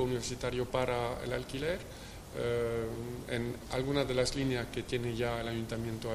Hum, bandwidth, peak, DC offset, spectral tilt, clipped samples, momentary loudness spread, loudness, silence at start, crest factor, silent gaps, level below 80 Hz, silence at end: none; 15.5 kHz; -14 dBFS; under 0.1%; -5 dB/octave; under 0.1%; 7 LU; -35 LUFS; 0 s; 20 dB; none; -50 dBFS; 0 s